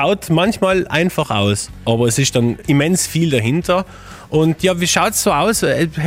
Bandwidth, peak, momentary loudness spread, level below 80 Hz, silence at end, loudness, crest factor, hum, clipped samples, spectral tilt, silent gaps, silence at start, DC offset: 16.5 kHz; 0 dBFS; 4 LU; -42 dBFS; 0 s; -16 LUFS; 14 dB; none; under 0.1%; -4.5 dB/octave; none; 0 s; under 0.1%